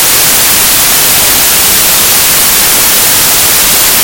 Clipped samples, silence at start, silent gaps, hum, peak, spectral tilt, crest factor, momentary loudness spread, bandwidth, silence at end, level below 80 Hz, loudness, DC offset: 5%; 0 s; none; none; 0 dBFS; 0 dB/octave; 6 dB; 0 LU; over 20 kHz; 0 s; -30 dBFS; -3 LUFS; under 0.1%